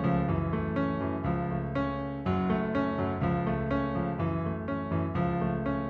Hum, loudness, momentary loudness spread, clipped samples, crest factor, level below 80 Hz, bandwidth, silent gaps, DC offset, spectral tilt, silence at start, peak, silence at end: none; -30 LUFS; 3 LU; under 0.1%; 14 dB; -44 dBFS; 5.2 kHz; none; under 0.1%; -10 dB/octave; 0 s; -16 dBFS; 0 s